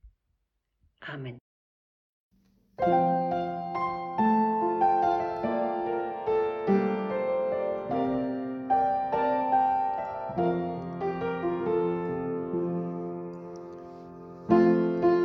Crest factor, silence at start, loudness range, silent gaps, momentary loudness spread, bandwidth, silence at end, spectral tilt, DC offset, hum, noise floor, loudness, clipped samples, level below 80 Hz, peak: 18 dB; 0.05 s; 5 LU; 1.41-2.31 s; 16 LU; 6.2 kHz; 0 s; -9 dB/octave; under 0.1%; none; -78 dBFS; -28 LUFS; under 0.1%; -62 dBFS; -10 dBFS